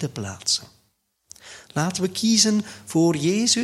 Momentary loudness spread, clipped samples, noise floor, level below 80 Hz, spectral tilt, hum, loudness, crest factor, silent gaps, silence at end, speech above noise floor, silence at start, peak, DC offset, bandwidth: 13 LU; under 0.1%; -69 dBFS; -62 dBFS; -3.5 dB/octave; none; -22 LUFS; 18 dB; none; 0 s; 47 dB; 0 s; -4 dBFS; under 0.1%; 14.5 kHz